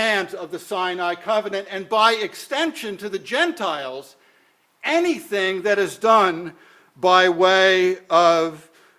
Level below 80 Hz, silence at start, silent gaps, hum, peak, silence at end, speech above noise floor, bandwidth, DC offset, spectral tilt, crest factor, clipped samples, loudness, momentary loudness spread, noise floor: -70 dBFS; 0 s; none; none; 0 dBFS; 0.4 s; 40 dB; 16 kHz; under 0.1%; -3.5 dB/octave; 20 dB; under 0.1%; -20 LUFS; 14 LU; -60 dBFS